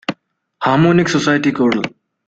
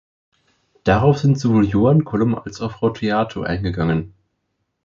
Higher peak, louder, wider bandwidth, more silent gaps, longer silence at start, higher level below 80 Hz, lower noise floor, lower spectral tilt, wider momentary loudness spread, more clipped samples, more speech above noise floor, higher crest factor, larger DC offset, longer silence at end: about the same, -2 dBFS vs -2 dBFS; first, -15 LUFS vs -19 LUFS; first, 9 kHz vs 7.4 kHz; neither; second, 0.1 s vs 0.85 s; second, -54 dBFS vs -40 dBFS; second, -46 dBFS vs -73 dBFS; second, -6 dB/octave vs -8 dB/octave; about the same, 11 LU vs 9 LU; neither; second, 32 dB vs 55 dB; about the same, 14 dB vs 16 dB; neither; second, 0.4 s vs 0.75 s